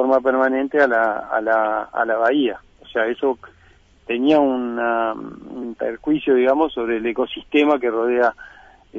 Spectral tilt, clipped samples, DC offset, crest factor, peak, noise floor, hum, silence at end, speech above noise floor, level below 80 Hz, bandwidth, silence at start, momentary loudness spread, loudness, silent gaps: -6.5 dB/octave; under 0.1%; under 0.1%; 14 dB; -4 dBFS; -51 dBFS; none; 0 s; 32 dB; -56 dBFS; 7.2 kHz; 0 s; 10 LU; -19 LUFS; none